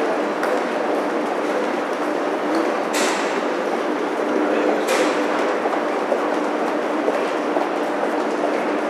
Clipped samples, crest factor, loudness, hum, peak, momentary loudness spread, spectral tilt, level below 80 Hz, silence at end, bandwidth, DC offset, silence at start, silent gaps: under 0.1%; 16 dB; -21 LUFS; none; -6 dBFS; 3 LU; -3.5 dB/octave; -76 dBFS; 0 s; 14.5 kHz; under 0.1%; 0 s; none